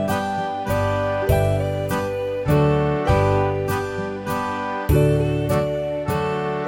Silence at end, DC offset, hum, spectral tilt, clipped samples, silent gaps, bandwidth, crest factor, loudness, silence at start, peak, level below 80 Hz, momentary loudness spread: 0 s; under 0.1%; none; -7 dB/octave; under 0.1%; none; 17 kHz; 14 dB; -21 LUFS; 0 s; -6 dBFS; -34 dBFS; 7 LU